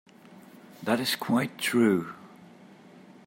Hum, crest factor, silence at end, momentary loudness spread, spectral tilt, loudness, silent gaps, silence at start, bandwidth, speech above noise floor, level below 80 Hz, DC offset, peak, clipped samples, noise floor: none; 20 dB; 0.25 s; 16 LU; -4.5 dB/octave; -27 LUFS; none; 0.3 s; 16.5 kHz; 26 dB; -76 dBFS; under 0.1%; -10 dBFS; under 0.1%; -52 dBFS